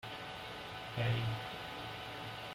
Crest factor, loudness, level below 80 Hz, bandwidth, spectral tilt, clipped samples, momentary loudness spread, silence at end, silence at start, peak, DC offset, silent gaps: 18 dB; -41 LUFS; -62 dBFS; 16 kHz; -5.5 dB/octave; under 0.1%; 9 LU; 0 s; 0 s; -24 dBFS; under 0.1%; none